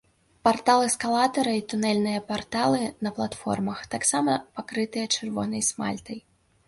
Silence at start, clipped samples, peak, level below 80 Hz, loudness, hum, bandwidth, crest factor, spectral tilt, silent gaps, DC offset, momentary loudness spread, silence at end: 0.45 s; under 0.1%; -6 dBFS; -60 dBFS; -25 LUFS; none; 11.5 kHz; 20 dB; -3.5 dB/octave; none; under 0.1%; 9 LU; 0.5 s